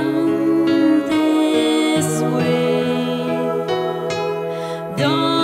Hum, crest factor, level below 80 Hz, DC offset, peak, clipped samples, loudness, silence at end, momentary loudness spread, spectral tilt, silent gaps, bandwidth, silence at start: none; 12 dB; -60 dBFS; under 0.1%; -6 dBFS; under 0.1%; -18 LUFS; 0 s; 6 LU; -5.5 dB/octave; none; 15.5 kHz; 0 s